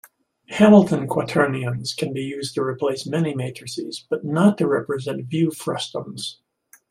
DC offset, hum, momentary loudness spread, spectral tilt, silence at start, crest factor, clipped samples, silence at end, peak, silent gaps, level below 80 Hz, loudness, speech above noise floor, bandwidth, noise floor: under 0.1%; none; 15 LU; -6 dB/octave; 0.5 s; 20 dB; under 0.1%; 0.55 s; -2 dBFS; none; -62 dBFS; -21 LUFS; 25 dB; 14.5 kHz; -46 dBFS